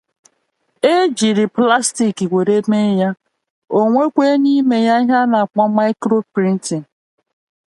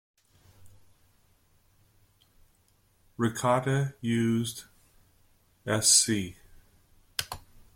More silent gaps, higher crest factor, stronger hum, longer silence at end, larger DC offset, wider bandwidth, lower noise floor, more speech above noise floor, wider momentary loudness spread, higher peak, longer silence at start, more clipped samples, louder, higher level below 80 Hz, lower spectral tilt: first, 3.50-3.62 s vs none; second, 16 dB vs 24 dB; neither; first, 0.9 s vs 0.35 s; neither; second, 11.5 kHz vs 16.5 kHz; about the same, -66 dBFS vs -66 dBFS; first, 52 dB vs 40 dB; second, 5 LU vs 22 LU; first, 0 dBFS vs -8 dBFS; first, 0.85 s vs 0.65 s; neither; first, -15 LUFS vs -26 LUFS; about the same, -66 dBFS vs -62 dBFS; first, -5 dB/octave vs -3.5 dB/octave